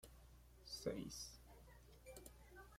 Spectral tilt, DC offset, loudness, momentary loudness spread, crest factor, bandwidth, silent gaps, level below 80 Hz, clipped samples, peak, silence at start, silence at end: -4 dB/octave; under 0.1%; -53 LUFS; 17 LU; 22 dB; 16.5 kHz; none; -66 dBFS; under 0.1%; -32 dBFS; 0 s; 0 s